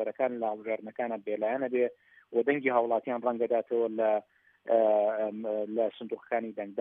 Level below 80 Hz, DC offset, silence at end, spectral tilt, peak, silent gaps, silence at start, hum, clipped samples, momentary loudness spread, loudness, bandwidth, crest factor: under -90 dBFS; under 0.1%; 0 s; -4.5 dB/octave; -12 dBFS; none; 0 s; none; under 0.1%; 8 LU; -30 LUFS; 3.8 kHz; 18 dB